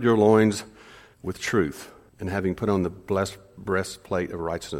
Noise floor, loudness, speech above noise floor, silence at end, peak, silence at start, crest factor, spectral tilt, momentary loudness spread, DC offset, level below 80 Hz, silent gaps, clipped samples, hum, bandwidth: -49 dBFS; -25 LUFS; 25 dB; 0 s; -6 dBFS; 0 s; 20 dB; -6 dB/octave; 19 LU; under 0.1%; -52 dBFS; none; under 0.1%; none; 16.5 kHz